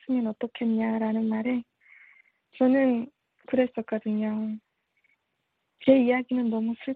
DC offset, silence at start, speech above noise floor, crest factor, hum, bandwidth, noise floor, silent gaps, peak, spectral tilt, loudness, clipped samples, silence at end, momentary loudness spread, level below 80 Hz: under 0.1%; 0.1 s; 53 dB; 20 dB; none; 4.4 kHz; -78 dBFS; none; -8 dBFS; -9.5 dB/octave; -26 LUFS; under 0.1%; 0 s; 10 LU; -72 dBFS